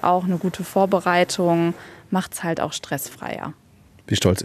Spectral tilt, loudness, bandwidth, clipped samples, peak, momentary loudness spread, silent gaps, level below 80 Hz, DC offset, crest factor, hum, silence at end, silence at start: -5 dB/octave; -22 LUFS; 14 kHz; under 0.1%; -2 dBFS; 12 LU; none; -54 dBFS; under 0.1%; 20 dB; none; 0 s; 0 s